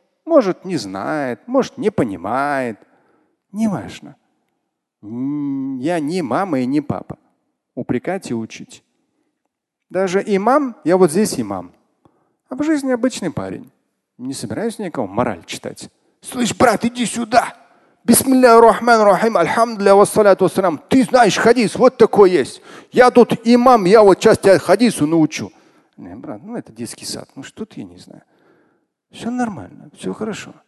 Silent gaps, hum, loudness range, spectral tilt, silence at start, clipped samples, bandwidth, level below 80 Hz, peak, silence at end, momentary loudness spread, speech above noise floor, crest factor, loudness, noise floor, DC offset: none; none; 14 LU; -5 dB/octave; 0.25 s; under 0.1%; 12.5 kHz; -52 dBFS; 0 dBFS; 0.15 s; 21 LU; 60 dB; 16 dB; -15 LUFS; -76 dBFS; under 0.1%